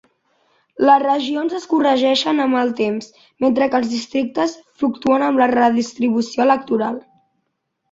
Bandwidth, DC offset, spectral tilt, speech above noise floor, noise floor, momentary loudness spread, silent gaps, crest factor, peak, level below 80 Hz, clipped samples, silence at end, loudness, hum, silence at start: 7.8 kHz; under 0.1%; -4.5 dB/octave; 56 dB; -73 dBFS; 8 LU; none; 16 dB; -2 dBFS; -62 dBFS; under 0.1%; 0.9 s; -18 LUFS; none; 0.8 s